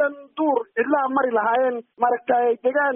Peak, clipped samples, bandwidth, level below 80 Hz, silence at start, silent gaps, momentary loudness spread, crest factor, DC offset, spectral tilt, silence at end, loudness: -8 dBFS; under 0.1%; 3.6 kHz; -74 dBFS; 0 s; none; 4 LU; 14 dB; under 0.1%; 3 dB/octave; 0 s; -21 LUFS